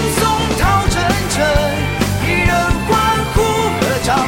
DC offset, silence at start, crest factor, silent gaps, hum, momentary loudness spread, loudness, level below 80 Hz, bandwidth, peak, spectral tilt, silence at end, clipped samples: under 0.1%; 0 s; 12 dB; none; none; 2 LU; -15 LUFS; -24 dBFS; 17 kHz; -2 dBFS; -4.5 dB/octave; 0 s; under 0.1%